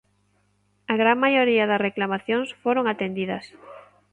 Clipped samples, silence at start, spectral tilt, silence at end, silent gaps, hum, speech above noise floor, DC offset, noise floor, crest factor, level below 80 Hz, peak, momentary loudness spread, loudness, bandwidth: under 0.1%; 0.9 s; -6.5 dB/octave; 0.35 s; none; 50 Hz at -50 dBFS; 44 dB; under 0.1%; -66 dBFS; 18 dB; -70 dBFS; -6 dBFS; 12 LU; -22 LUFS; 9.6 kHz